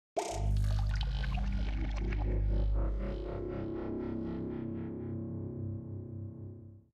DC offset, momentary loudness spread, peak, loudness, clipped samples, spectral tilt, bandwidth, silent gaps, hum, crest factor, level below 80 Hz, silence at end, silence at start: under 0.1%; 10 LU; -20 dBFS; -37 LUFS; under 0.1%; -7 dB/octave; 9.2 kHz; none; none; 14 dB; -36 dBFS; 0.15 s; 0.15 s